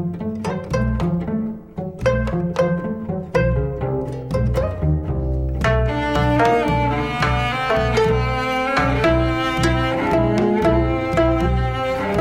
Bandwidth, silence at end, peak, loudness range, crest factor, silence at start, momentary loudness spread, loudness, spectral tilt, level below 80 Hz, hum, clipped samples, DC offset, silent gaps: 13.5 kHz; 0 s; -4 dBFS; 4 LU; 14 dB; 0 s; 7 LU; -20 LUFS; -7 dB/octave; -28 dBFS; none; under 0.1%; 0.1%; none